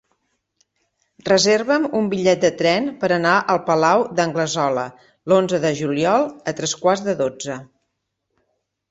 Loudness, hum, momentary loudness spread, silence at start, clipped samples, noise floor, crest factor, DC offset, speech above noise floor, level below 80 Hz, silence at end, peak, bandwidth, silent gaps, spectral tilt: -19 LUFS; none; 9 LU; 1.25 s; under 0.1%; -75 dBFS; 18 dB; under 0.1%; 57 dB; -60 dBFS; 1.25 s; -2 dBFS; 8 kHz; none; -4 dB/octave